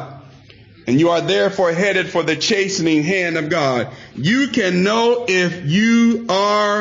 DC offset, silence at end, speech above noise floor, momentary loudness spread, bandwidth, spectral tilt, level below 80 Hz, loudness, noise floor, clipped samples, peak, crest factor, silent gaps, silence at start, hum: under 0.1%; 0 s; 28 dB; 5 LU; 7.6 kHz; -5 dB/octave; -58 dBFS; -16 LUFS; -44 dBFS; under 0.1%; -6 dBFS; 10 dB; none; 0 s; none